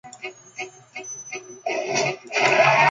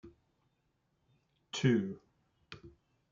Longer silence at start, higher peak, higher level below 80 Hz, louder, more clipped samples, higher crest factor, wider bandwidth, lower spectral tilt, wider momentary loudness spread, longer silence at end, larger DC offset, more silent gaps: about the same, 0.05 s vs 0.05 s; first, -4 dBFS vs -16 dBFS; about the same, -72 dBFS vs -74 dBFS; first, -21 LUFS vs -33 LUFS; neither; about the same, 20 dB vs 24 dB; first, 9.4 kHz vs 7.6 kHz; second, -2.5 dB/octave vs -6 dB/octave; about the same, 20 LU vs 22 LU; second, 0 s vs 0.45 s; neither; neither